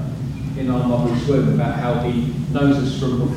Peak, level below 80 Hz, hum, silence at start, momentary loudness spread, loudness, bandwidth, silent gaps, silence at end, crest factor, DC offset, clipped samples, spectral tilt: -4 dBFS; -38 dBFS; none; 0 s; 7 LU; -20 LUFS; 11.5 kHz; none; 0 s; 14 dB; under 0.1%; under 0.1%; -8 dB/octave